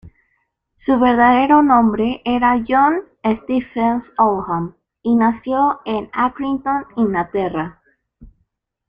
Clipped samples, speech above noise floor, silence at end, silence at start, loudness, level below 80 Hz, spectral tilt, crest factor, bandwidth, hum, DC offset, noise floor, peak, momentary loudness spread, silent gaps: under 0.1%; 52 dB; 0.65 s; 0.05 s; -17 LUFS; -48 dBFS; -8.5 dB/octave; 16 dB; 5 kHz; none; under 0.1%; -68 dBFS; -2 dBFS; 11 LU; none